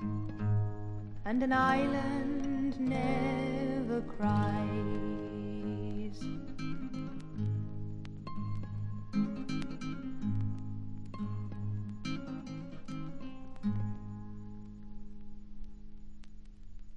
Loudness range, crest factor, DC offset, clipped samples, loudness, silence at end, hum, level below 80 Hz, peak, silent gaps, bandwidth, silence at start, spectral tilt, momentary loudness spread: 11 LU; 20 dB; under 0.1%; under 0.1%; -36 LUFS; 0 s; none; -50 dBFS; -16 dBFS; none; 9.8 kHz; 0 s; -8 dB/octave; 17 LU